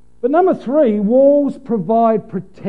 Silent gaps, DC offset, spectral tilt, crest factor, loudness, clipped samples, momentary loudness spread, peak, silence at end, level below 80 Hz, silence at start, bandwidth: none; 0.8%; -10 dB/octave; 12 dB; -14 LUFS; under 0.1%; 9 LU; -2 dBFS; 0 s; -56 dBFS; 0.25 s; 4.8 kHz